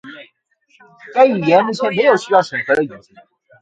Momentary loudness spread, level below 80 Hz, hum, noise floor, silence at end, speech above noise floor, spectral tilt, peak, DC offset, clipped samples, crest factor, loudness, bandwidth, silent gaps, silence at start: 10 LU; -64 dBFS; none; -58 dBFS; 0.65 s; 42 dB; -5.5 dB/octave; 0 dBFS; under 0.1%; under 0.1%; 16 dB; -15 LUFS; 9 kHz; none; 0.05 s